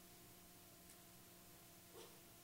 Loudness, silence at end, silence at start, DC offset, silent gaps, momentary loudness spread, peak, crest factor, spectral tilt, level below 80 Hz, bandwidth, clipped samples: -61 LUFS; 0 s; 0 s; under 0.1%; none; 2 LU; -46 dBFS; 18 dB; -3 dB/octave; -80 dBFS; 16 kHz; under 0.1%